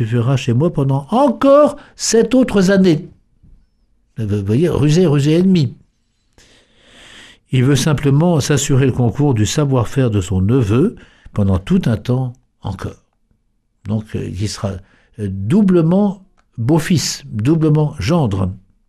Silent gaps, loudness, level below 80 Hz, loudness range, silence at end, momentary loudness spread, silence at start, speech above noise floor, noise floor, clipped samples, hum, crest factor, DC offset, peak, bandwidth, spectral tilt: none; -15 LUFS; -40 dBFS; 7 LU; 0.3 s; 13 LU; 0 s; 48 dB; -63 dBFS; under 0.1%; none; 14 dB; under 0.1%; -2 dBFS; 14 kHz; -6.5 dB/octave